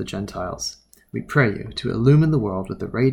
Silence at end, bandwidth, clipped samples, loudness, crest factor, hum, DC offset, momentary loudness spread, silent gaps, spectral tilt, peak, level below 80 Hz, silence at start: 0 s; 11.5 kHz; under 0.1%; -21 LUFS; 18 dB; none; under 0.1%; 13 LU; none; -6.5 dB/octave; -4 dBFS; -44 dBFS; 0 s